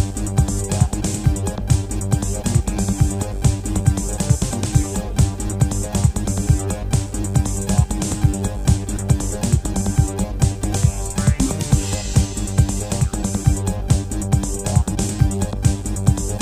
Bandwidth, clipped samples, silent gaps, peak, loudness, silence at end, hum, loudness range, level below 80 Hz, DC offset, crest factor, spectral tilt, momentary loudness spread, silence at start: 16 kHz; under 0.1%; none; 0 dBFS; -20 LUFS; 0 s; none; 0 LU; -24 dBFS; under 0.1%; 18 dB; -5.5 dB/octave; 2 LU; 0 s